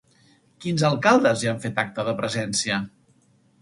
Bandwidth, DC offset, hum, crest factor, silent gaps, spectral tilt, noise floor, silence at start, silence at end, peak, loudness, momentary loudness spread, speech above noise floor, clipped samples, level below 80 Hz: 11.5 kHz; under 0.1%; none; 22 dB; none; -4.5 dB/octave; -60 dBFS; 0.6 s; 0.75 s; -4 dBFS; -22 LUFS; 10 LU; 38 dB; under 0.1%; -62 dBFS